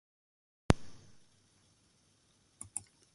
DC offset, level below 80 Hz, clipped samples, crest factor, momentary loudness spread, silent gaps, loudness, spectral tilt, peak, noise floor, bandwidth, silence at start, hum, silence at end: under 0.1%; -50 dBFS; under 0.1%; 36 dB; 20 LU; none; -36 LUFS; -5.5 dB/octave; -6 dBFS; -70 dBFS; 11.5 kHz; 0.7 s; none; 0.35 s